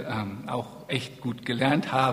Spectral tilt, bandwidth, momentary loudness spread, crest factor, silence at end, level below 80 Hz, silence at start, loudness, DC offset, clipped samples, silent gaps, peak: -6 dB/octave; 15.5 kHz; 10 LU; 20 dB; 0 s; -62 dBFS; 0 s; -29 LUFS; under 0.1%; under 0.1%; none; -8 dBFS